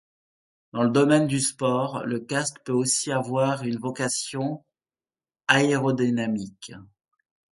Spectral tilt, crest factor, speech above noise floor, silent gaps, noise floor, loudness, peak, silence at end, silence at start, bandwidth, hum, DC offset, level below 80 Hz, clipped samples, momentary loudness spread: -4.5 dB/octave; 24 dB; over 66 dB; none; under -90 dBFS; -24 LUFS; -2 dBFS; 0.65 s; 0.75 s; 11.5 kHz; none; under 0.1%; -66 dBFS; under 0.1%; 12 LU